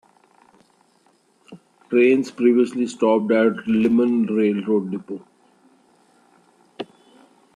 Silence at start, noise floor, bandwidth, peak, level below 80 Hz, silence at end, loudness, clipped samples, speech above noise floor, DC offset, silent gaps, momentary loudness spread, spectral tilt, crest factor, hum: 1.5 s; -60 dBFS; 10 kHz; -6 dBFS; -66 dBFS; 0.7 s; -19 LUFS; under 0.1%; 42 dB; under 0.1%; none; 19 LU; -7 dB/octave; 16 dB; none